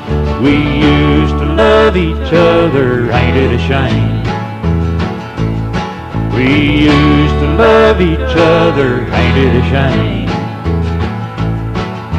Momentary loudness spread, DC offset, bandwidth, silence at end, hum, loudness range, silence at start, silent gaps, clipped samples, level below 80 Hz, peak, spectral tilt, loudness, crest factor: 9 LU; under 0.1%; 9.2 kHz; 0 s; none; 4 LU; 0 s; none; under 0.1%; -20 dBFS; 0 dBFS; -7.5 dB/octave; -11 LUFS; 10 dB